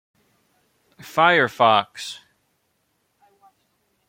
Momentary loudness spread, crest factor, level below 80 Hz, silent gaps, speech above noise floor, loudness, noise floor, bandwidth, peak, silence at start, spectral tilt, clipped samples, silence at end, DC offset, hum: 18 LU; 22 dB; -72 dBFS; none; 51 dB; -18 LUFS; -70 dBFS; 16.5 kHz; -2 dBFS; 1.05 s; -4 dB/octave; under 0.1%; 1.95 s; under 0.1%; none